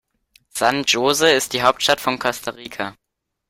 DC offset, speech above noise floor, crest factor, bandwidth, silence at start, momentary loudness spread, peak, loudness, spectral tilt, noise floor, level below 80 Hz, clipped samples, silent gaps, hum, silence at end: under 0.1%; 40 dB; 20 dB; 16.5 kHz; 0.55 s; 14 LU; 0 dBFS; -18 LUFS; -2 dB/octave; -59 dBFS; -56 dBFS; under 0.1%; none; none; 0.6 s